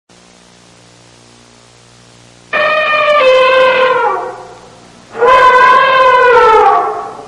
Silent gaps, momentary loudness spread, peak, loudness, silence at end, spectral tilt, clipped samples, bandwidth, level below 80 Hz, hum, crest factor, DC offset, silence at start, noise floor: none; 12 LU; 0 dBFS; -8 LUFS; 0 s; -2.5 dB/octave; 0.4%; 11 kHz; -46 dBFS; 60 Hz at -55 dBFS; 10 dB; under 0.1%; 2.55 s; -42 dBFS